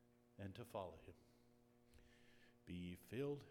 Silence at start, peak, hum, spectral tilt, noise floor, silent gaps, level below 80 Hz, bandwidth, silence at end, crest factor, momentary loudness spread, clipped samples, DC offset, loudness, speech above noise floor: 0 s; -34 dBFS; none; -7 dB/octave; -73 dBFS; none; -78 dBFS; 19.5 kHz; 0 s; 20 dB; 17 LU; under 0.1%; under 0.1%; -53 LUFS; 22 dB